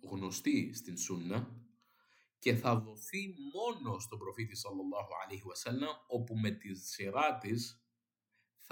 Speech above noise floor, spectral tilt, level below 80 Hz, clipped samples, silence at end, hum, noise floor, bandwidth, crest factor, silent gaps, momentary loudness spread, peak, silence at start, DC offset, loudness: 49 dB; -5 dB/octave; -82 dBFS; under 0.1%; 0.05 s; none; -87 dBFS; 17.5 kHz; 22 dB; none; 10 LU; -18 dBFS; 0.05 s; under 0.1%; -38 LUFS